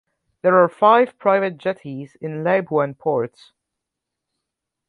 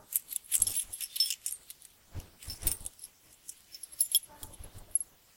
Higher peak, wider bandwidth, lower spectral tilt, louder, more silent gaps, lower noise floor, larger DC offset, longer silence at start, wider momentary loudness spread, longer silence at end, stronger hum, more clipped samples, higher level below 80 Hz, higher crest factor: first, -2 dBFS vs -6 dBFS; second, 4.8 kHz vs 17 kHz; first, -8 dB/octave vs 0.5 dB/octave; first, -18 LUFS vs -31 LUFS; neither; first, -82 dBFS vs -54 dBFS; neither; first, 0.45 s vs 0.1 s; second, 16 LU vs 21 LU; first, 1.6 s vs 0.35 s; neither; neither; second, -70 dBFS vs -54 dBFS; second, 18 dB vs 30 dB